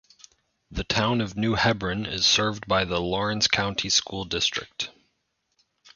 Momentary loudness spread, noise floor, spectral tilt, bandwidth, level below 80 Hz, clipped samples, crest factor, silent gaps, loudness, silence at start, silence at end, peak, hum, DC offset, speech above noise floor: 12 LU; -75 dBFS; -3 dB/octave; 7.4 kHz; -46 dBFS; under 0.1%; 24 dB; none; -24 LUFS; 0.7 s; 0.05 s; -4 dBFS; none; under 0.1%; 50 dB